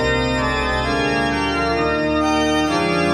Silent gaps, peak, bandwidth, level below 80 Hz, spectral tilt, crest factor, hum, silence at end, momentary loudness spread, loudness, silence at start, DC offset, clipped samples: none; -6 dBFS; 13 kHz; -32 dBFS; -5 dB/octave; 12 dB; none; 0 s; 2 LU; -18 LUFS; 0 s; under 0.1%; under 0.1%